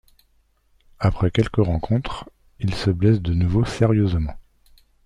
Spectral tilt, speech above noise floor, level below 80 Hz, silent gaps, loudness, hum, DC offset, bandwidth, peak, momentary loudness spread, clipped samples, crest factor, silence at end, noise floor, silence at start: -8 dB/octave; 42 dB; -36 dBFS; none; -21 LUFS; none; under 0.1%; 10.5 kHz; -4 dBFS; 9 LU; under 0.1%; 18 dB; 0.65 s; -62 dBFS; 1 s